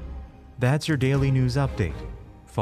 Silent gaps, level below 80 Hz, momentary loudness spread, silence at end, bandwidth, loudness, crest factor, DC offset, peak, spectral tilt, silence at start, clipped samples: none; -40 dBFS; 20 LU; 0 s; 13 kHz; -24 LUFS; 14 dB; under 0.1%; -10 dBFS; -7 dB/octave; 0 s; under 0.1%